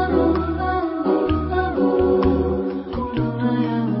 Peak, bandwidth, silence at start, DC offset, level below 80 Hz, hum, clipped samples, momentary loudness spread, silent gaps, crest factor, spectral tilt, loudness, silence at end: -6 dBFS; 5.8 kHz; 0 s; under 0.1%; -32 dBFS; none; under 0.1%; 6 LU; none; 14 dB; -12.5 dB/octave; -21 LUFS; 0 s